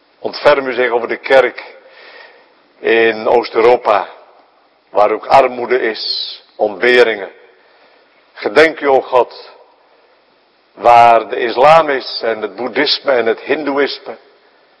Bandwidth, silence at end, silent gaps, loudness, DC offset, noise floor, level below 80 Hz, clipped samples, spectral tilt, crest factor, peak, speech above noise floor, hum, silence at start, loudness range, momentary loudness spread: 11 kHz; 0.65 s; none; -13 LUFS; under 0.1%; -53 dBFS; -54 dBFS; 0.6%; -4.5 dB/octave; 14 dB; 0 dBFS; 41 dB; none; 0.25 s; 4 LU; 12 LU